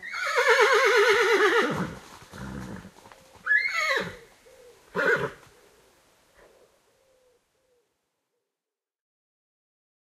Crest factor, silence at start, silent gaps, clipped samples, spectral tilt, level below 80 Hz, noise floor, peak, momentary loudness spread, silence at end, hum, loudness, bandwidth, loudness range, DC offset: 20 dB; 0 s; none; under 0.1%; -3 dB/octave; -60 dBFS; under -90 dBFS; -8 dBFS; 22 LU; 4.65 s; none; -23 LUFS; 14.5 kHz; 10 LU; under 0.1%